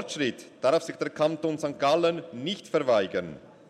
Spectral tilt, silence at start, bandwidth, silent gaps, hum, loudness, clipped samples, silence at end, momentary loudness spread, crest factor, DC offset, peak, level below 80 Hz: -5 dB/octave; 0 s; 13 kHz; none; none; -27 LUFS; under 0.1%; 0.2 s; 9 LU; 16 dB; under 0.1%; -12 dBFS; -70 dBFS